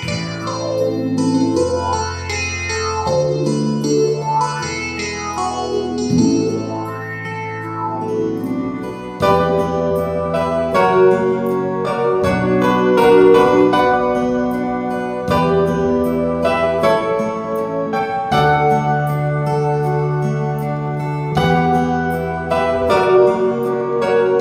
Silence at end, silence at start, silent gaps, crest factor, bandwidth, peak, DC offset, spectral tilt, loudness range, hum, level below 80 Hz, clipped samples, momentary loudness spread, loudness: 0 s; 0 s; none; 16 dB; 15 kHz; 0 dBFS; under 0.1%; -6 dB/octave; 6 LU; none; -42 dBFS; under 0.1%; 9 LU; -17 LUFS